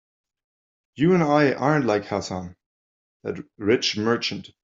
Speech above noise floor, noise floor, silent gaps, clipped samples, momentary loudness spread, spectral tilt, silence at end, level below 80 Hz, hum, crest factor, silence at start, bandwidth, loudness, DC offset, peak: over 68 dB; under -90 dBFS; 2.66-3.20 s; under 0.1%; 15 LU; -5.5 dB/octave; 0.15 s; -64 dBFS; none; 18 dB; 0.95 s; 7.8 kHz; -22 LUFS; under 0.1%; -6 dBFS